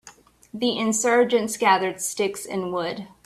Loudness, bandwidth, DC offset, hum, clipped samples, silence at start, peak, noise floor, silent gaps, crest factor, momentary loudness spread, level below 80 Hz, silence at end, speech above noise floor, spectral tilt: -23 LUFS; 15.5 kHz; under 0.1%; none; under 0.1%; 0.05 s; -4 dBFS; -51 dBFS; none; 18 dB; 9 LU; -66 dBFS; 0.2 s; 28 dB; -3 dB/octave